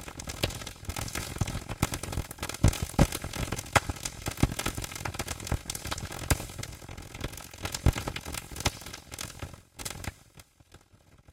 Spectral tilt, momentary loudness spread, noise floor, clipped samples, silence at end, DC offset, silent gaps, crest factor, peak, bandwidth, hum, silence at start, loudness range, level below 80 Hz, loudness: -4 dB/octave; 13 LU; -59 dBFS; under 0.1%; 0 s; under 0.1%; none; 26 dB; -6 dBFS; 17 kHz; none; 0 s; 5 LU; -40 dBFS; -33 LUFS